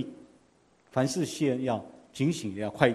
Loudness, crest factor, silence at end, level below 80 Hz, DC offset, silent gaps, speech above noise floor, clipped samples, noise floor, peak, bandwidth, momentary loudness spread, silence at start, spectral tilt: -30 LUFS; 26 dB; 0 s; -64 dBFS; under 0.1%; none; 36 dB; under 0.1%; -64 dBFS; -4 dBFS; 13 kHz; 7 LU; 0 s; -5.5 dB/octave